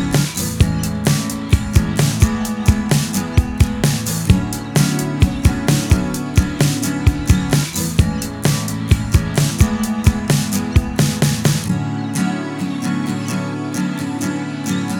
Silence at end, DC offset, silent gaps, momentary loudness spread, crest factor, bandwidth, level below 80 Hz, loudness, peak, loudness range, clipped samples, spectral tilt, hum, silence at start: 0 s; under 0.1%; none; 6 LU; 16 dB; 19 kHz; -26 dBFS; -18 LUFS; 0 dBFS; 2 LU; under 0.1%; -5 dB/octave; none; 0 s